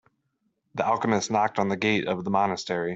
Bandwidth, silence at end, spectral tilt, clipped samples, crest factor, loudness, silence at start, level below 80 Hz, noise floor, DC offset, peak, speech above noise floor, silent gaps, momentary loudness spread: 8.2 kHz; 0 s; -5 dB/octave; under 0.1%; 18 dB; -25 LUFS; 0.75 s; -64 dBFS; -75 dBFS; under 0.1%; -8 dBFS; 50 dB; none; 5 LU